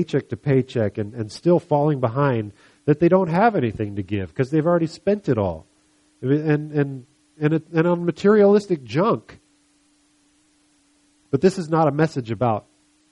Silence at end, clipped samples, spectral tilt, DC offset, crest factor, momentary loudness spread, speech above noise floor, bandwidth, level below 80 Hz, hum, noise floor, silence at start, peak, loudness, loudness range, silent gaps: 0.5 s; under 0.1%; -8 dB/octave; under 0.1%; 18 dB; 10 LU; 41 dB; 11.5 kHz; -56 dBFS; none; -61 dBFS; 0 s; -4 dBFS; -21 LUFS; 4 LU; none